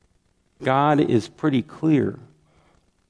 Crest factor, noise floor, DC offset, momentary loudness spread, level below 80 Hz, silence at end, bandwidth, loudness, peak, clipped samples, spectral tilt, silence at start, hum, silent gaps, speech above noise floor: 18 dB; -65 dBFS; under 0.1%; 10 LU; -62 dBFS; 0.85 s; 10.5 kHz; -21 LUFS; -4 dBFS; under 0.1%; -7.5 dB/octave; 0.6 s; none; none; 45 dB